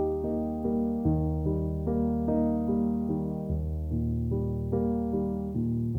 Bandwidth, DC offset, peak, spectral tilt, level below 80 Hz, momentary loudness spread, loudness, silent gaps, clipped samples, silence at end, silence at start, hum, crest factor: 2 kHz; under 0.1%; -14 dBFS; -12 dB/octave; -38 dBFS; 4 LU; -29 LUFS; none; under 0.1%; 0 s; 0 s; none; 14 dB